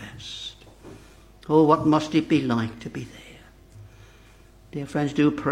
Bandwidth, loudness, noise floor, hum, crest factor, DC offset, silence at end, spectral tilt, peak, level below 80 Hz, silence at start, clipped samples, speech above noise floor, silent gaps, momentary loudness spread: 10.5 kHz; -23 LUFS; -51 dBFS; none; 22 dB; under 0.1%; 0 s; -6.5 dB/octave; -4 dBFS; -54 dBFS; 0 s; under 0.1%; 29 dB; none; 20 LU